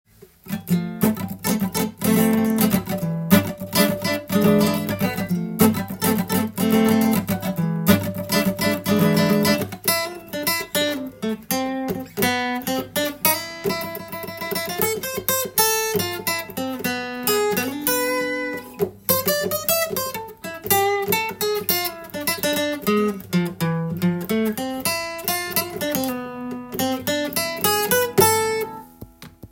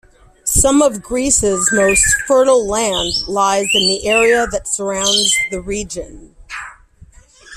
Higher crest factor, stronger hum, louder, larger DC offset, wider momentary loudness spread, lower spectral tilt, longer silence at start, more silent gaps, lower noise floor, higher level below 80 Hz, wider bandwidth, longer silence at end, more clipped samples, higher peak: first, 22 dB vs 16 dB; neither; second, -21 LUFS vs -14 LUFS; neither; second, 9 LU vs 14 LU; first, -4 dB/octave vs -2 dB/octave; about the same, 0.45 s vs 0.45 s; neither; about the same, -42 dBFS vs -44 dBFS; second, -54 dBFS vs -34 dBFS; about the same, 17 kHz vs 16 kHz; about the same, 0.05 s vs 0 s; neither; about the same, 0 dBFS vs 0 dBFS